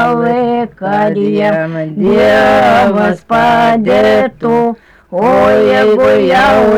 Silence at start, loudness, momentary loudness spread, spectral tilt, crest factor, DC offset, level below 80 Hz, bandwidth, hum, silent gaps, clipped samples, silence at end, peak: 0 s; -10 LUFS; 8 LU; -6.5 dB/octave; 6 dB; under 0.1%; -40 dBFS; 18.5 kHz; none; none; under 0.1%; 0 s; -4 dBFS